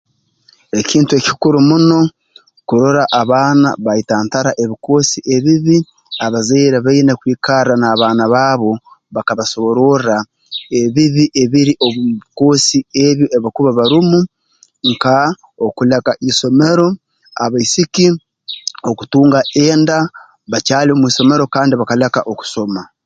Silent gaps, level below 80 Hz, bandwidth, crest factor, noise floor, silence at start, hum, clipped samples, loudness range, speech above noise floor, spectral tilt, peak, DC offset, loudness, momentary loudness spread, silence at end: none; -52 dBFS; 9.2 kHz; 12 dB; -52 dBFS; 0.75 s; none; under 0.1%; 2 LU; 40 dB; -5 dB/octave; 0 dBFS; under 0.1%; -13 LUFS; 10 LU; 0.2 s